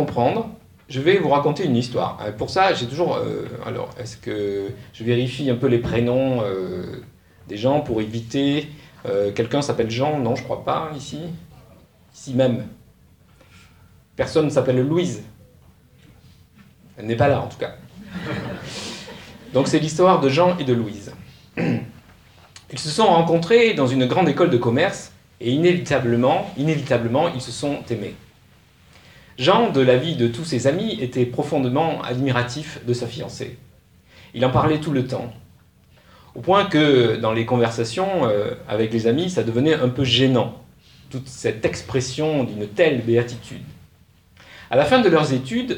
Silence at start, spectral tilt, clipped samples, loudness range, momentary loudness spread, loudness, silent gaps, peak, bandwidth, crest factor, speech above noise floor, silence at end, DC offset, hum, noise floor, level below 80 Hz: 0 s; -6 dB/octave; under 0.1%; 6 LU; 16 LU; -20 LUFS; none; -2 dBFS; 18 kHz; 20 dB; 34 dB; 0 s; under 0.1%; none; -54 dBFS; -52 dBFS